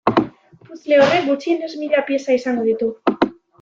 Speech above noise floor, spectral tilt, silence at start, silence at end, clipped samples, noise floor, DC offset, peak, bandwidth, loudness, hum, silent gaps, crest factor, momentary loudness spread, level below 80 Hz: 20 dB; -5.5 dB/octave; 0.05 s; 0.3 s; under 0.1%; -38 dBFS; under 0.1%; -2 dBFS; 7.6 kHz; -18 LUFS; none; none; 16 dB; 8 LU; -58 dBFS